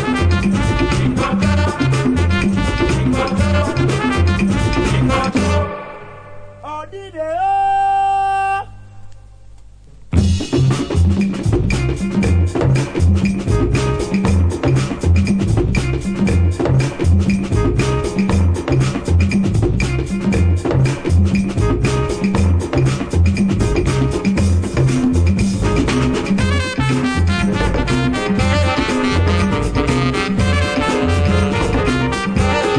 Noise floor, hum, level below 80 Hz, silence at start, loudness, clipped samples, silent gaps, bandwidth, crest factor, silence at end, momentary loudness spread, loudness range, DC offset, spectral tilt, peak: -39 dBFS; 50 Hz at -40 dBFS; -24 dBFS; 0 s; -16 LUFS; under 0.1%; none; 10.5 kHz; 14 dB; 0 s; 3 LU; 3 LU; under 0.1%; -6.5 dB/octave; -2 dBFS